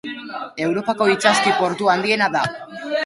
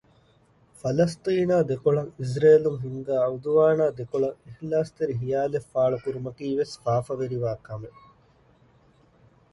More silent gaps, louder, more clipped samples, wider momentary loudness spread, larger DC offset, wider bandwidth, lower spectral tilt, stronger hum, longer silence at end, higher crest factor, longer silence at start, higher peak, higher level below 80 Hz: neither; first, -18 LUFS vs -25 LUFS; neither; about the same, 15 LU vs 13 LU; neither; about the same, 11.5 kHz vs 11.5 kHz; second, -3.5 dB/octave vs -7.5 dB/octave; neither; second, 0 s vs 1.65 s; about the same, 18 dB vs 18 dB; second, 0.05 s vs 0.85 s; first, -2 dBFS vs -8 dBFS; about the same, -62 dBFS vs -60 dBFS